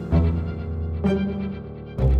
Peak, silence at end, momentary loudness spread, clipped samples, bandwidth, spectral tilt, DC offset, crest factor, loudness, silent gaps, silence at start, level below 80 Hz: -8 dBFS; 0 s; 11 LU; under 0.1%; 5 kHz; -10 dB/octave; under 0.1%; 14 dB; -25 LUFS; none; 0 s; -28 dBFS